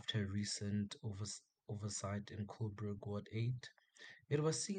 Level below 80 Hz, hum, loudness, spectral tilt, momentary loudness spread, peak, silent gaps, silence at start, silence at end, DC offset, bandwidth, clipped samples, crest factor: -76 dBFS; none; -43 LUFS; -5 dB/octave; 12 LU; -24 dBFS; none; 0 s; 0 s; under 0.1%; 9.8 kHz; under 0.1%; 18 dB